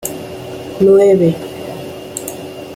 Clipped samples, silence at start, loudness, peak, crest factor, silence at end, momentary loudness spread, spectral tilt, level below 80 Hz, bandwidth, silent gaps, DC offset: under 0.1%; 0 s; -13 LUFS; -2 dBFS; 14 dB; 0 s; 19 LU; -6 dB/octave; -52 dBFS; 16.5 kHz; none; under 0.1%